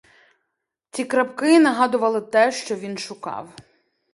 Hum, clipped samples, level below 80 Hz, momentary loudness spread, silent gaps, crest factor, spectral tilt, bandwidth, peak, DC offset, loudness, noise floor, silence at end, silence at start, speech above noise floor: none; under 0.1%; -70 dBFS; 16 LU; none; 18 dB; -4 dB/octave; 11.5 kHz; -4 dBFS; under 0.1%; -20 LUFS; -79 dBFS; 0.65 s; 0.95 s; 59 dB